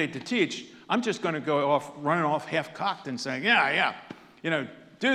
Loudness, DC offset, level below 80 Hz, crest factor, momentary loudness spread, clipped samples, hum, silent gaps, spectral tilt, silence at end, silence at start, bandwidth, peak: -27 LUFS; under 0.1%; -76 dBFS; 20 dB; 12 LU; under 0.1%; none; none; -4.5 dB/octave; 0 s; 0 s; 13.5 kHz; -8 dBFS